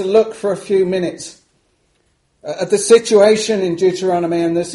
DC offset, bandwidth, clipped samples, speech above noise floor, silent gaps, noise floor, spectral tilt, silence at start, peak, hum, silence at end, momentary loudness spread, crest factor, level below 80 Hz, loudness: under 0.1%; 11.5 kHz; under 0.1%; 47 dB; none; -61 dBFS; -4.5 dB/octave; 0 s; 0 dBFS; none; 0 s; 15 LU; 16 dB; -58 dBFS; -15 LUFS